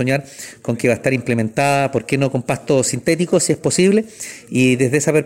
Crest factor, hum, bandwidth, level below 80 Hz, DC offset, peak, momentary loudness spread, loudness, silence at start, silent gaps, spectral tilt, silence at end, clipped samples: 16 dB; none; 16.5 kHz; -54 dBFS; under 0.1%; -2 dBFS; 9 LU; -17 LUFS; 0 s; none; -5 dB/octave; 0 s; under 0.1%